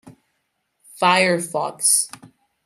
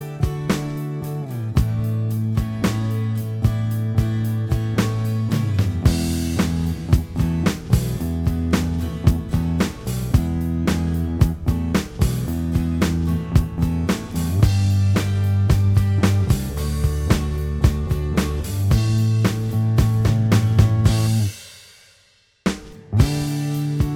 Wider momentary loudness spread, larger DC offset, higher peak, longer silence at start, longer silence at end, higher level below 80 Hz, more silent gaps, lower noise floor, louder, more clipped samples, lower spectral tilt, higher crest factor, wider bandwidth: first, 9 LU vs 6 LU; neither; about the same, -2 dBFS vs -2 dBFS; about the same, 0.05 s vs 0 s; first, 0.4 s vs 0 s; second, -72 dBFS vs -28 dBFS; neither; first, -73 dBFS vs -57 dBFS; first, -18 LUFS vs -21 LUFS; neither; second, -2 dB/octave vs -6.5 dB/octave; about the same, 22 dB vs 18 dB; about the same, 16 kHz vs 16.5 kHz